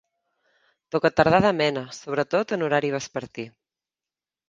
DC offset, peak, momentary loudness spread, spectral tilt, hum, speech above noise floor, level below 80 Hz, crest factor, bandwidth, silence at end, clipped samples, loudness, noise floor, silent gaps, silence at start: under 0.1%; -2 dBFS; 15 LU; -5.5 dB/octave; none; over 67 dB; -56 dBFS; 24 dB; 9.6 kHz; 1 s; under 0.1%; -23 LUFS; under -90 dBFS; none; 0.95 s